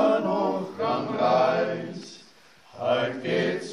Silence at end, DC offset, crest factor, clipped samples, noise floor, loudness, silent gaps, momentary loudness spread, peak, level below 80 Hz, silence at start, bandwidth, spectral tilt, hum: 0 s; under 0.1%; 16 dB; under 0.1%; -54 dBFS; -25 LUFS; none; 12 LU; -10 dBFS; -72 dBFS; 0 s; 10.5 kHz; -6 dB/octave; none